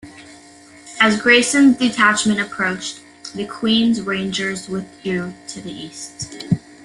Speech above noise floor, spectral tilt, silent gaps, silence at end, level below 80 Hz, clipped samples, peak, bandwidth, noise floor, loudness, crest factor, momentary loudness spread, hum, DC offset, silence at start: 26 dB; -3.5 dB/octave; none; 0.25 s; -54 dBFS; under 0.1%; 0 dBFS; 12.5 kHz; -44 dBFS; -17 LUFS; 18 dB; 18 LU; none; under 0.1%; 0.05 s